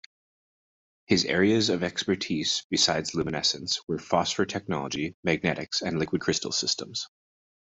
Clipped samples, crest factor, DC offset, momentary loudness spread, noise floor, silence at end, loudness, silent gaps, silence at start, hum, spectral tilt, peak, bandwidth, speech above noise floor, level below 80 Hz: under 0.1%; 22 dB; under 0.1%; 7 LU; under -90 dBFS; 0.6 s; -26 LUFS; 2.64-2.70 s, 5.14-5.23 s; 1.1 s; none; -3.5 dB/octave; -6 dBFS; 8.2 kHz; over 63 dB; -62 dBFS